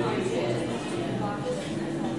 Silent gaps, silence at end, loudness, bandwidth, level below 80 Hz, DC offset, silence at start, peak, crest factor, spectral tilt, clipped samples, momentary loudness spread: none; 0 s; -30 LUFS; 11.5 kHz; -56 dBFS; 0.2%; 0 s; -16 dBFS; 14 dB; -6 dB/octave; under 0.1%; 3 LU